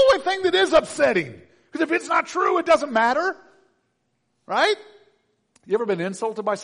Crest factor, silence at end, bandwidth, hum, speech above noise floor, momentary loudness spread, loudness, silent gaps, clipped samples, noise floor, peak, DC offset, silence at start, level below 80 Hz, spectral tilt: 16 dB; 0 s; 10.5 kHz; none; 51 dB; 9 LU; -21 LUFS; none; under 0.1%; -72 dBFS; -6 dBFS; under 0.1%; 0 s; -58 dBFS; -3.5 dB/octave